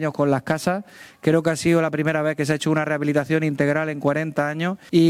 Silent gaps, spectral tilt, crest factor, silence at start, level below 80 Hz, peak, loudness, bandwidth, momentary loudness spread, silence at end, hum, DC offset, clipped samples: none; -6.5 dB/octave; 14 dB; 0 s; -58 dBFS; -6 dBFS; -22 LUFS; 15.5 kHz; 5 LU; 0 s; none; under 0.1%; under 0.1%